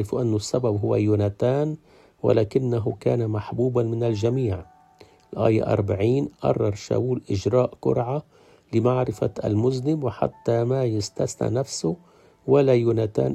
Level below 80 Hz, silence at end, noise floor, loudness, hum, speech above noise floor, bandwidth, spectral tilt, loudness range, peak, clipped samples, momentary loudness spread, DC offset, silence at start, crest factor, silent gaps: -54 dBFS; 0 s; -53 dBFS; -23 LUFS; none; 31 dB; 11.5 kHz; -7.5 dB/octave; 1 LU; -4 dBFS; under 0.1%; 7 LU; under 0.1%; 0 s; 18 dB; none